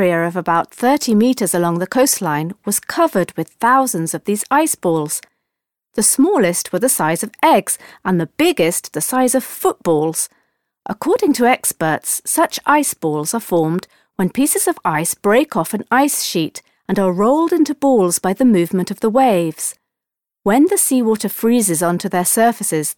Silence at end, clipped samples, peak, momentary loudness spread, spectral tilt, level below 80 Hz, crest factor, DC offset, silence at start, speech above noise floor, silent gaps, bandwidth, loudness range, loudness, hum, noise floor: 0.05 s; under 0.1%; -2 dBFS; 8 LU; -4 dB/octave; -58 dBFS; 14 dB; under 0.1%; 0 s; 69 dB; none; 19 kHz; 2 LU; -16 LUFS; none; -85 dBFS